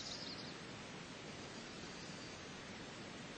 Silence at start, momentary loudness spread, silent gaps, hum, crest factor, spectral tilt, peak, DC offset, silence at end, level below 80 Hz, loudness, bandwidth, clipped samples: 0 s; 4 LU; none; none; 14 dB; -3.5 dB/octave; -36 dBFS; under 0.1%; 0 s; -70 dBFS; -49 LUFS; 8.8 kHz; under 0.1%